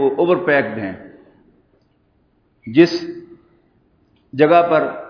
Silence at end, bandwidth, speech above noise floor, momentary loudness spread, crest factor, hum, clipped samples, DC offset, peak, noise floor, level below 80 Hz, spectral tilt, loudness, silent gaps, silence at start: 0 s; 5.4 kHz; 44 dB; 21 LU; 18 dB; none; under 0.1%; under 0.1%; 0 dBFS; -60 dBFS; -62 dBFS; -7 dB/octave; -16 LUFS; none; 0 s